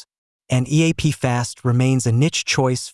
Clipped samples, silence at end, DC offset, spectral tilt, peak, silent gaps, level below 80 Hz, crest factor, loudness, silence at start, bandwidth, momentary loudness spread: under 0.1%; 0.05 s; under 0.1%; -5 dB/octave; -4 dBFS; none; -48 dBFS; 16 dB; -19 LUFS; 0.5 s; 12 kHz; 4 LU